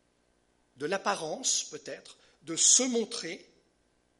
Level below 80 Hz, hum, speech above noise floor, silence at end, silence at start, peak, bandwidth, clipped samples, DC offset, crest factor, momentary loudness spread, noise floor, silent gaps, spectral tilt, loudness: -78 dBFS; 60 Hz at -70 dBFS; 41 dB; 0.75 s; 0.8 s; -8 dBFS; 11.5 kHz; under 0.1%; under 0.1%; 24 dB; 22 LU; -71 dBFS; none; -0.5 dB/octave; -27 LUFS